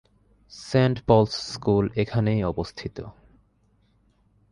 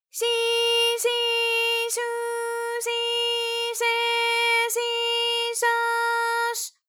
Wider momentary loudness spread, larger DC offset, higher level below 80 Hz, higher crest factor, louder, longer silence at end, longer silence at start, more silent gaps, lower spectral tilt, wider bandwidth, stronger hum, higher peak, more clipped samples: first, 18 LU vs 7 LU; neither; first, -46 dBFS vs under -90 dBFS; first, 20 dB vs 12 dB; about the same, -24 LUFS vs -23 LUFS; first, 1.4 s vs 0.2 s; first, 0.5 s vs 0.15 s; neither; first, -7 dB/octave vs 6 dB/octave; second, 11 kHz vs over 20 kHz; neither; first, -4 dBFS vs -12 dBFS; neither